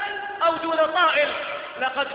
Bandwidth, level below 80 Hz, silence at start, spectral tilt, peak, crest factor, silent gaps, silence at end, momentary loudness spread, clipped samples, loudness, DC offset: 5.2 kHz; -66 dBFS; 0 s; -7 dB/octave; -8 dBFS; 14 dB; none; 0 s; 10 LU; under 0.1%; -22 LUFS; under 0.1%